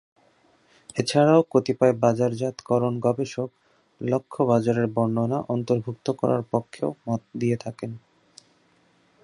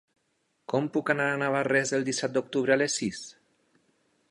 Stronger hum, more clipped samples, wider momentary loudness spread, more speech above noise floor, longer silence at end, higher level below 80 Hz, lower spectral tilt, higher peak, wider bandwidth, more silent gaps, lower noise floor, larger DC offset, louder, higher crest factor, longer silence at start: neither; neither; first, 13 LU vs 10 LU; second, 39 dB vs 47 dB; first, 1.25 s vs 1 s; first, -64 dBFS vs -72 dBFS; first, -7 dB/octave vs -4 dB/octave; first, -4 dBFS vs -8 dBFS; about the same, 11.5 kHz vs 11.5 kHz; neither; second, -62 dBFS vs -74 dBFS; neither; first, -24 LUFS vs -27 LUFS; about the same, 20 dB vs 20 dB; first, 0.95 s vs 0.7 s